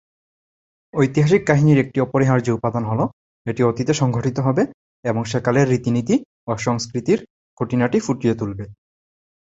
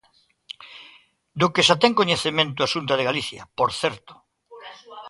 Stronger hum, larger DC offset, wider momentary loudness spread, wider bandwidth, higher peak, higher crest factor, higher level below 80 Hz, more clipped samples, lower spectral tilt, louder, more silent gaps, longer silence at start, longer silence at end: neither; neither; second, 12 LU vs 25 LU; second, 8 kHz vs 11.5 kHz; about the same, -2 dBFS vs -2 dBFS; about the same, 18 dB vs 22 dB; first, -52 dBFS vs -60 dBFS; neither; first, -7 dB/octave vs -3.5 dB/octave; about the same, -20 LUFS vs -21 LUFS; first, 3.13-3.45 s, 4.74-5.03 s, 6.25-6.47 s, 7.30-7.57 s vs none; first, 0.95 s vs 0.6 s; first, 0.85 s vs 0 s